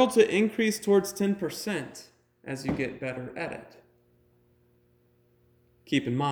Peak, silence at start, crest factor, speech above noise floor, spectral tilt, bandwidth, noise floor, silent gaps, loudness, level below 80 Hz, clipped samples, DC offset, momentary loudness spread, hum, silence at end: -8 dBFS; 0 s; 22 dB; 38 dB; -5 dB/octave; over 20 kHz; -65 dBFS; none; -28 LUFS; -62 dBFS; under 0.1%; under 0.1%; 16 LU; 60 Hz at -60 dBFS; 0 s